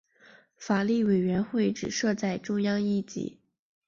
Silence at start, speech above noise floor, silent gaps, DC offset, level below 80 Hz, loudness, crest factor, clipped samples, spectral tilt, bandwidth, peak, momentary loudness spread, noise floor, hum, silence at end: 0.6 s; 31 dB; none; under 0.1%; -64 dBFS; -28 LUFS; 14 dB; under 0.1%; -5.5 dB/octave; 7.4 kHz; -14 dBFS; 12 LU; -58 dBFS; none; 0.55 s